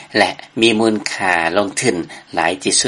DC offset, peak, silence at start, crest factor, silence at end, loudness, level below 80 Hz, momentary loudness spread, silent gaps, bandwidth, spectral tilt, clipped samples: under 0.1%; 0 dBFS; 0 s; 16 dB; 0 s; -16 LUFS; -56 dBFS; 5 LU; none; 11.5 kHz; -2.5 dB/octave; under 0.1%